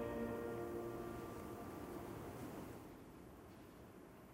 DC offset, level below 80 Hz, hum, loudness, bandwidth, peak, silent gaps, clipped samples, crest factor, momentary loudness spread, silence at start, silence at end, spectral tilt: under 0.1%; -64 dBFS; none; -50 LUFS; 16 kHz; -34 dBFS; none; under 0.1%; 16 dB; 14 LU; 0 s; 0 s; -6.5 dB/octave